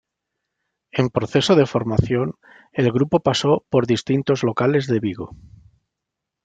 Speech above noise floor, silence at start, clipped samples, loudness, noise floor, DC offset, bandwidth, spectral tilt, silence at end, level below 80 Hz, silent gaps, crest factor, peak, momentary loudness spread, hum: 63 dB; 0.95 s; under 0.1%; -20 LUFS; -83 dBFS; under 0.1%; 9.2 kHz; -6.5 dB/octave; 1.1 s; -48 dBFS; none; 18 dB; -2 dBFS; 11 LU; none